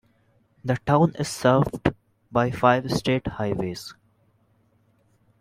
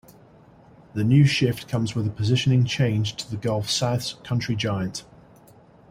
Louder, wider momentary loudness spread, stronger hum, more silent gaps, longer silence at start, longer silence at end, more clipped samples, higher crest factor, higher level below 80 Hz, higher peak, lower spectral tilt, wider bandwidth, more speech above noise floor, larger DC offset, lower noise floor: about the same, -23 LUFS vs -23 LUFS; about the same, 11 LU vs 10 LU; neither; neither; second, 0.65 s vs 0.95 s; first, 1.5 s vs 0.85 s; neither; about the same, 22 dB vs 18 dB; about the same, -50 dBFS vs -54 dBFS; first, -2 dBFS vs -6 dBFS; about the same, -6.5 dB/octave vs -5.5 dB/octave; about the same, 15.5 kHz vs 15.5 kHz; first, 41 dB vs 29 dB; neither; first, -64 dBFS vs -52 dBFS